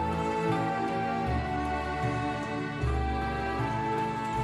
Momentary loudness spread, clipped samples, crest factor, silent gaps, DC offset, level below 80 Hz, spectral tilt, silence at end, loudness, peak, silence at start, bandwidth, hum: 3 LU; under 0.1%; 14 dB; none; under 0.1%; -40 dBFS; -7 dB/octave; 0 s; -30 LUFS; -16 dBFS; 0 s; 12.5 kHz; none